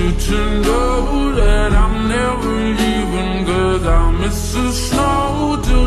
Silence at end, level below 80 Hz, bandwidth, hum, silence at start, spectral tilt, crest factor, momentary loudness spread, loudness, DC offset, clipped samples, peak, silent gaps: 0 s; -18 dBFS; 13 kHz; none; 0 s; -5.5 dB/octave; 12 dB; 3 LU; -17 LUFS; under 0.1%; under 0.1%; -2 dBFS; none